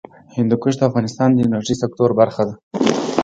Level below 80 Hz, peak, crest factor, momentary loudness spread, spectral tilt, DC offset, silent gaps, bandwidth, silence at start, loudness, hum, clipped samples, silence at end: -52 dBFS; 0 dBFS; 18 dB; 7 LU; -6.5 dB/octave; under 0.1%; 2.63-2.71 s; 9 kHz; 0.35 s; -18 LUFS; none; under 0.1%; 0 s